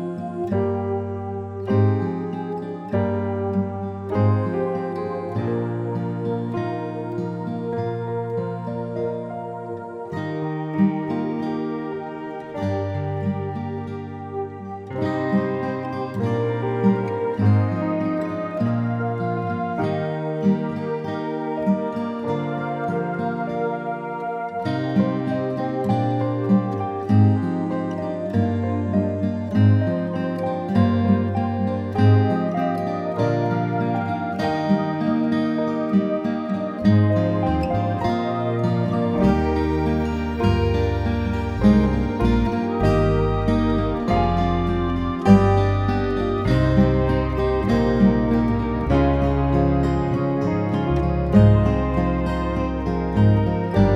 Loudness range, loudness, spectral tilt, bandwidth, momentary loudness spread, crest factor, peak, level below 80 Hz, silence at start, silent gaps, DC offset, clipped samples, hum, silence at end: 7 LU; -22 LUFS; -9 dB/octave; 7.6 kHz; 10 LU; 20 dB; 0 dBFS; -34 dBFS; 0 s; none; under 0.1%; under 0.1%; none; 0 s